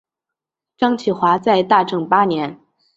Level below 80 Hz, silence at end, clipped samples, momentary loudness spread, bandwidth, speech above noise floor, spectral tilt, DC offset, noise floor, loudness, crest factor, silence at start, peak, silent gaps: -62 dBFS; 0.4 s; under 0.1%; 7 LU; 8 kHz; 69 dB; -6.5 dB/octave; under 0.1%; -85 dBFS; -17 LUFS; 18 dB; 0.8 s; 0 dBFS; none